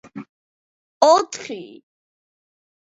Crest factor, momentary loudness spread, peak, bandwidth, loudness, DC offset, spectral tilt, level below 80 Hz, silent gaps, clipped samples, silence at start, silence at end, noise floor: 24 dB; 24 LU; 0 dBFS; 8 kHz; -17 LUFS; under 0.1%; -2.5 dB/octave; -74 dBFS; 0.29-1.01 s; under 0.1%; 0.15 s; 1.3 s; under -90 dBFS